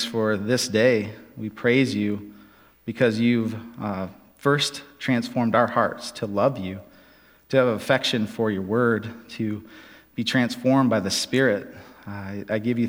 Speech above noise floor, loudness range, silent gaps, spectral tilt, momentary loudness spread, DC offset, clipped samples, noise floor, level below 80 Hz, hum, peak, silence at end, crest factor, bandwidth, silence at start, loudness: 31 dB; 2 LU; none; -5 dB/octave; 15 LU; under 0.1%; under 0.1%; -54 dBFS; -64 dBFS; none; -4 dBFS; 0 s; 20 dB; 16.5 kHz; 0 s; -23 LUFS